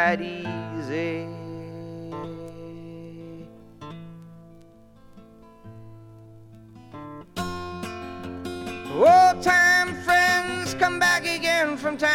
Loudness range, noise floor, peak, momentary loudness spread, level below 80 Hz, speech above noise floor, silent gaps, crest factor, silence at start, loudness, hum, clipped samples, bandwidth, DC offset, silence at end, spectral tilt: 24 LU; -50 dBFS; -6 dBFS; 24 LU; -56 dBFS; 25 dB; none; 20 dB; 0 s; -21 LUFS; none; under 0.1%; 17 kHz; under 0.1%; 0 s; -3.5 dB/octave